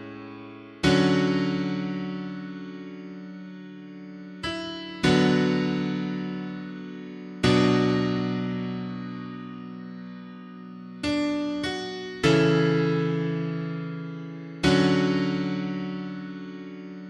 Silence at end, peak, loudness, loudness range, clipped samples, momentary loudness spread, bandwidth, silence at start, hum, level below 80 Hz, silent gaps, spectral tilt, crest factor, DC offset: 0 s; -6 dBFS; -26 LUFS; 8 LU; under 0.1%; 20 LU; 11 kHz; 0 s; none; -52 dBFS; none; -6.5 dB/octave; 20 dB; under 0.1%